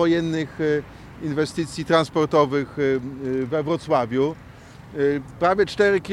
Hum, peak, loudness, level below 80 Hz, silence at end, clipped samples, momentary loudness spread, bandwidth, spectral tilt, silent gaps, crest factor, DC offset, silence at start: none; -4 dBFS; -22 LUFS; -50 dBFS; 0 s; under 0.1%; 9 LU; 12 kHz; -6 dB/octave; none; 18 dB; under 0.1%; 0 s